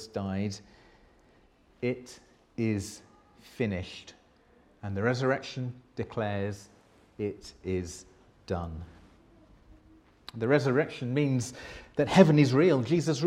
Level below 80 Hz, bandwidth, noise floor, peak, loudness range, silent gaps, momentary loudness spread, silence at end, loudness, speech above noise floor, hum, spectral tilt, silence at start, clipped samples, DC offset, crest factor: -58 dBFS; 13 kHz; -62 dBFS; -4 dBFS; 13 LU; none; 22 LU; 0 s; -29 LUFS; 34 dB; none; -6.5 dB/octave; 0 s; under 0.1%; under 0.1%; 26 dB